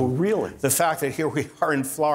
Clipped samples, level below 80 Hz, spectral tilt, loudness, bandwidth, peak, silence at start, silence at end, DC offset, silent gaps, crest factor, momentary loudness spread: under 0.1%; -60 dBFS; -4.5 dB/octave; -23 LUFS; 16 kHz; -6 dBFS; 0 s; 0 s; under 0.1%; none; 16 dB; 5 LU